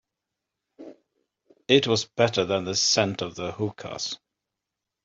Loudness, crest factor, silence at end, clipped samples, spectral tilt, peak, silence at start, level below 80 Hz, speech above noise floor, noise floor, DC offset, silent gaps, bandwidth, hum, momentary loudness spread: -24 LUFS; 24 dB; 0.9 s; under 0.1%; -3.5 dB/octave; -2 dBFS; 0.8 s; -66 dBFS; 61 dB; -86 dBFS; under 0.1%; none; 7.8 kHz; none; 12 LU